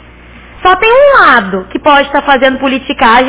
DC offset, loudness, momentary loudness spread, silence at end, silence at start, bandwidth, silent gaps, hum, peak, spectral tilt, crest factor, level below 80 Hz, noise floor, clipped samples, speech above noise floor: under 0.1%; -7 LUFS; 9 LU; 0 s; 0.55 s; 4 kHz; none; none; 0 dBFS; -7.5 dB/octave; 8 dB; -36 dBFS; -34 dBFS; 3%; 27 dB